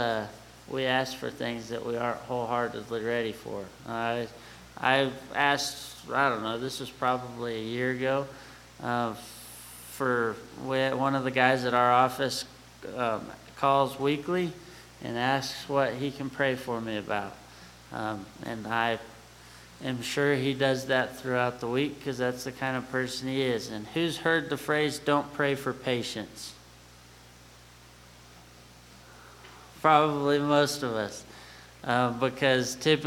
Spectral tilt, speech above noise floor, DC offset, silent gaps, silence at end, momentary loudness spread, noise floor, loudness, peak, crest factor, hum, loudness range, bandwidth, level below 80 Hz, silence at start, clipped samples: -4.5 dB/octave; 24 dB; under 0.1%; none; 0 s; 18 LU; -53 dBFS; -29 LUFS; -6 dBFS; 24 dB; 60 Hz at -55 dBFS; 6 LU; 18 kHz; -60 dBFS; 0 s; under 0.1%